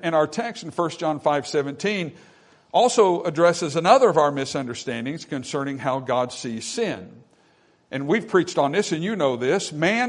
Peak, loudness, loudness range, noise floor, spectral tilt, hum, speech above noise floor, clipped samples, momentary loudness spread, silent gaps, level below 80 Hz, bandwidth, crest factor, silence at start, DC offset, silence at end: -2 dBFS; -22 LUFS; 7 LU; -60 dBFS; -4.5 dB/octave; none; 38 dB; under 0.1%; 12 LU; none; -68 dBFS; 11 kHz; 22 dB; 0 s; under 0.1%; 0 s